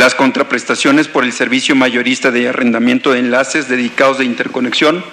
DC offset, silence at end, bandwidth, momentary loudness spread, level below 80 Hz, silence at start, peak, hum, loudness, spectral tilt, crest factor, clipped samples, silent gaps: under 0.1%; 0 s; 13 kHz; 4 LU; -62 dBFS; 0 s; 0 dBFS; none; -12 LUFS; -3.5 dB/octave; 12 dB; under 0.1%; none